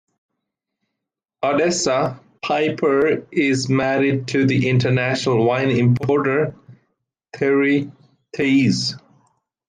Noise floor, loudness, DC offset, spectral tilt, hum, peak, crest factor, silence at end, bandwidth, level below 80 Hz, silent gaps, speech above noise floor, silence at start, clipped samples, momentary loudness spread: -82 dBFS; -19 LUFS; under 0.1%; -5.5 dB/octave; none; -6 dBFS; 14 dB; 0.7 s; 9.6 kHz; -60 dBFS; none; 65 dB; 1.4 s; under 0.1%; 8 LU